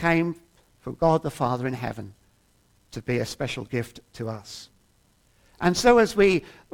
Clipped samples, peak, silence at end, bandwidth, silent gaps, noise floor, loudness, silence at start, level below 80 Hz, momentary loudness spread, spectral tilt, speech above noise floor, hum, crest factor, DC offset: under 0.1%; -6 dBFS; 0.25 s; 17.5 kHz; none; -63 dBFS; -24 LUFS; 0 s; -50 dBFS; 23 LU; -5.5 dB/octave; 39 dB; none; 20 dB; under 0.1%